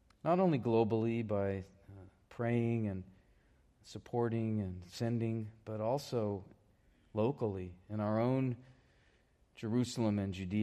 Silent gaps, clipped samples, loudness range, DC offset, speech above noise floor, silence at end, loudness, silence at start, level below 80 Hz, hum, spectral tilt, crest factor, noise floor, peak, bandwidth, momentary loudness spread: none; under 0.1%; 4 LU; under 0.1%; 35 dB; 0 s; -36 LUFS; 0.25 s; -70 dBFS; none; -7.5 dB/octave; 18 dB; -70 dBFS; -18 dBFS; 13 kHz; 13 LU